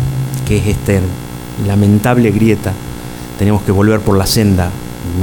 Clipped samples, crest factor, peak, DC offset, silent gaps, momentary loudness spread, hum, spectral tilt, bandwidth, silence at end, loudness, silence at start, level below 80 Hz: under 0.1%; 12 dB; 0 dBFS; under 0.1%; none; 14 LU; 60 Hz at -30 dBFS; -6.5 dB/octave; 19 kHz; 0 s; -13 LUFS; 0 s; -30 dBFS